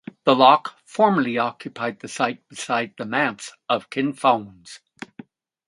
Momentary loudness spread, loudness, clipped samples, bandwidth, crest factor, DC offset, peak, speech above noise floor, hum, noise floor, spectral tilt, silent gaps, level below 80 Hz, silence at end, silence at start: 24 LU; -21 LUFS; under 0.1%; 11.5 kHz; 22 dB; under 0.1%; 0 dBFS; 24 dB; none; -46 dBFS; -4.5 dB/octave; none; -70 dBFS; 0.9 s; 0.25 s